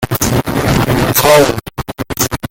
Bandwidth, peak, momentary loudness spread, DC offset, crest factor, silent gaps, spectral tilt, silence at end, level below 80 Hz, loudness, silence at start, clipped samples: 17.5 kHz; 0 dBFS; 13 LU; under 0.1%; 12 dB; none; -4.5 dB/octave; 0.05 s; -30 dBFS; -12 LUFS; 0 s; under 0.1%